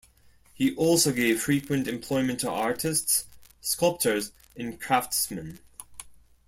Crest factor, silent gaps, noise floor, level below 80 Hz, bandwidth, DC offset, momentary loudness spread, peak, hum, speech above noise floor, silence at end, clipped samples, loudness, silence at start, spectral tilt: 18 dB; none; -58 dBFS; -58 dBFS; 16.5 kHz; under 0.1%; 20 LU; -10 dBFS; none; 32 dB; 0.35 s; under 0.1%; -26 LUFS; 0.6 s; -3.5 dB/octave